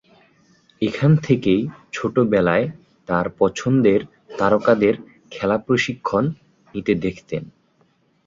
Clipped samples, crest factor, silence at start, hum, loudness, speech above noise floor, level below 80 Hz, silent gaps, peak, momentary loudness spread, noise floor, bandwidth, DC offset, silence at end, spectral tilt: under 0.1%; 18 dB; 0.8 s; none; -20 LUFS; 42 dB; -52 dBFS; none; -2 dBFS; 13 LU; -61 dBFS; 7.6 kHz; under 0.1%; 0.75 s; -7 dB/octave